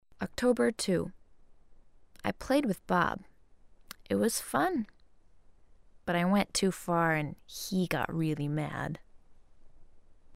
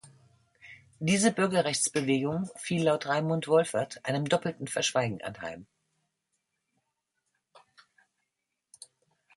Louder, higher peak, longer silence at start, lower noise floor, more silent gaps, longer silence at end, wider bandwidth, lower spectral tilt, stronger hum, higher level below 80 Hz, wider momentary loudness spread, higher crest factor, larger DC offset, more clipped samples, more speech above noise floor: second, -31 LUFS vs -28 LUFS; second, -14 dBFS vs -10 dBFS; first, 0.2 s vs 0.05 s; second, -61 dBFS vs -84 dBFS; neither; second, 0 s vs 1.8 s; first, 16 kHz vs 11.5 kHz; about the same, -5 dB/octave vs -4.5 dB/octave; neither; first, -58 dBFS vs -70 dBFS; first, 13 LU vs 10 LU; about the same, 18 dB vs 22 dB; neither; neither; second, 31 dB vs 56 dB